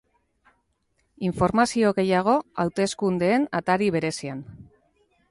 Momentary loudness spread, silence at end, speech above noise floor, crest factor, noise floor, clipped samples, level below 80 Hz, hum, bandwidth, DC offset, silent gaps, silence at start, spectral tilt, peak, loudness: 10 LU; 0.65 s; 48 dB; 18 dB; -71 dBFS; under 0.1%; -54 dBFS; none; 11.5 kHz; under 0.1%; none; 1.2 s; -5.5 dB/octave; -6 dBFS; -23 LUFS